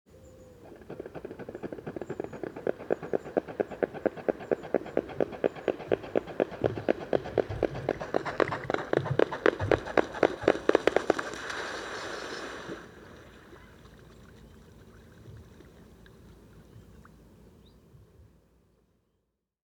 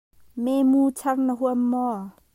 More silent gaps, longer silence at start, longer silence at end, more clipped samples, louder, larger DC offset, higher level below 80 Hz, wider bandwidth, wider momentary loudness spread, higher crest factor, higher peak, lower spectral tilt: neither; second, 0.15 s vs 0.35 s; first, 1.45 s vs 0.25 s; neither; second, -31 LUFS vs -23 LUFS; neither; first, -56 dBFS vs -66 dBFS; about the same, 16 kHz vs 16 kHz; first, 24 LU vs 11 LU; first, 26 dB vs 12 dB; first, -6 dBFS vs -12 dBFS; about the same, -6 dB/octave vs -6 dB/octave